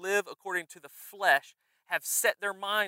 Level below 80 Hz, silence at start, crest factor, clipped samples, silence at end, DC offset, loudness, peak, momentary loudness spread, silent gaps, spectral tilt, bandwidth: under -90 dBFS; 0 s; 22 dB; under 0.1%; 0 s; under 0.1%; -29 LUFS; -10 dBFS; 18 LU; none; 0 dB/octave; 16 kHz